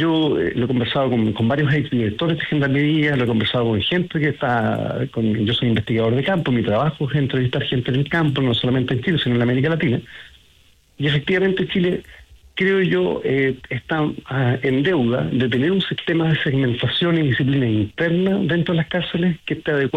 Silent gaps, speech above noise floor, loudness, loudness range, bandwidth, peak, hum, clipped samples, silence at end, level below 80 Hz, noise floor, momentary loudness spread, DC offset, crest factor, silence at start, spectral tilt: none; 35 dB; -19 LUFS; 2 LU; 8.8 kHz; -8 dBFS; none; under 0.1%; 0 s; -50 dBFS; -54 dBFS; 4 LU; under 0.1%; 10 dB; 0 s; -8 dB/octave